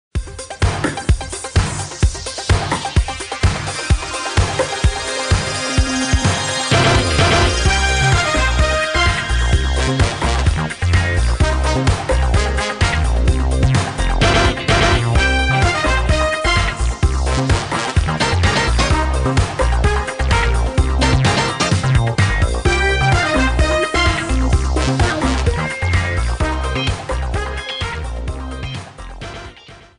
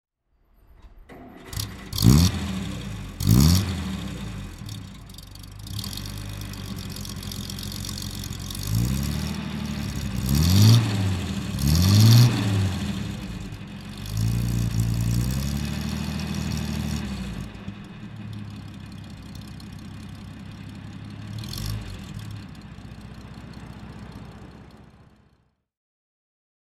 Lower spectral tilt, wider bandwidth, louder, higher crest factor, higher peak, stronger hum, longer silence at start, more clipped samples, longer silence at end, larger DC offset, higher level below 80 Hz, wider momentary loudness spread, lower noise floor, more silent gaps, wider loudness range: about the same, -4.5 dB/octave vs -5.5 dB/octave; second, 10.5 kHz vs 17 kHz; first, -17 LUFS vs -24 LUFS; second, 14 dB vs 24 dB; about the same, -2 dBFS vs -2 dBFS; neither; second, 0.15 s vs 0.85 s; neither; second, 0.2 s vs 1.95 s; neither; first, -20 dBFS vs -36 dBFS; second, 8 LU vs 23 LU; second, -40 dBFS vs -65 dBFS; neither; second, 5 LU vs 19 LU